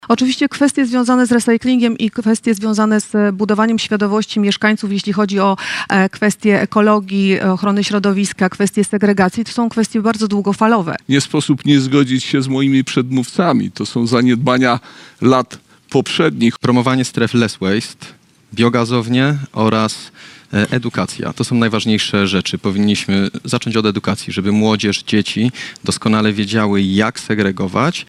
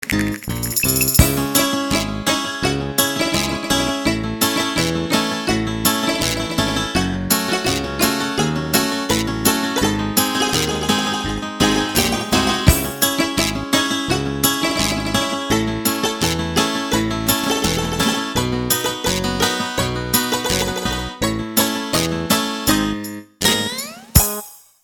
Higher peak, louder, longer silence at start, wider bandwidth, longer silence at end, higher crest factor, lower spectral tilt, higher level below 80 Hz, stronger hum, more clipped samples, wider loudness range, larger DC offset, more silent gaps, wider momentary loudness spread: about the same, 0 dBFS vs 0 dBFS; first, -15 LUFS vs -18 LUFS; about the same, 0.05 s vs 0 s; second, 12.5 kHz vs 18 kHz; second, 0.05 s vs 0.25 s; second, 14 dB vs 20 dB; first, -5.5 dB/octave vs -3.5 dB/octave; second, -54 dBFS vs -34 dBFS; neither; neither; about the same, 2 LU vs 2 LU; neither; neither; about the same, 5 LU vs 5 LU